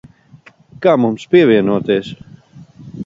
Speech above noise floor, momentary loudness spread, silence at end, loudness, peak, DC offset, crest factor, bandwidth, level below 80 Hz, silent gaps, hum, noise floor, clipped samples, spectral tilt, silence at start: 32 dB; 22 LU; 0 s; -14 LUFS; 0 dBFS; under 0.1%; 16 dB; 7.6 kHz; -54 dBFS; none; none; -45 dBFS; under 0.1%; -7.5 dB/octave; 0.8 s